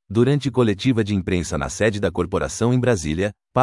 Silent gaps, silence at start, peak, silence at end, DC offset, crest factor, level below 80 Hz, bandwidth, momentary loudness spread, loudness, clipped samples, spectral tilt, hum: none; 0.1 s; -2 dBFS; 0 s; under 0.1%; 18 dB; -42 dBFS; 12 kHz; 5 LU; -21 LUFS; under 0.1%; -6 dB/octave; none